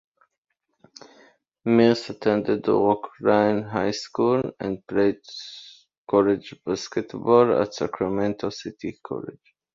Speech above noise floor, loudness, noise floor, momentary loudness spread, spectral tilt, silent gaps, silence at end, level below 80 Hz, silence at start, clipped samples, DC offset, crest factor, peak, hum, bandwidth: 34 dB; -23 LUFS; -57 dBFS; 15 LU; -6 dB/octave; 5.98-6.05 s; 0.45 s; -60 dBFS; 1.65 s; under 0.1%; under 0.1%; 20 dB; -4 dBFS; none; 7.6 kHz